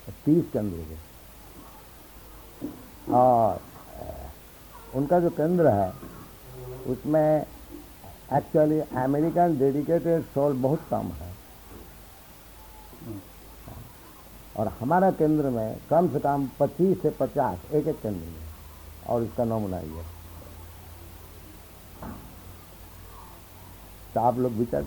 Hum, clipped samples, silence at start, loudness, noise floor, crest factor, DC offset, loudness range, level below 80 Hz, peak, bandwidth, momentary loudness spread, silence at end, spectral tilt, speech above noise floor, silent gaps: none; under 0.1%; 0 s; -25 LUFS; -48 dBFS; 20 dB; under 0.1%; 15 LU; -50 dBFS; -8 dBFS; 19.5 kHz; 23 LU; 0 s; -8 dB/octave; 24 dB; none